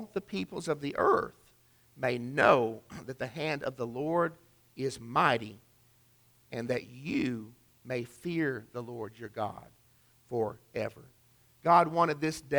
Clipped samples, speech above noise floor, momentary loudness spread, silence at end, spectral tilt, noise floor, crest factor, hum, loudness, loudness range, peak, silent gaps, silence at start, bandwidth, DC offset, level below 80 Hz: under 0.1%; 34 dB; 17 LU; 0 s; -6 dB/octave; -65 dBFS; 22 dB; none; -31 LUFS; 7 LU; -10 dBFS; none; 0 s; over 20 kHz; under 0.1%; -66 dBFS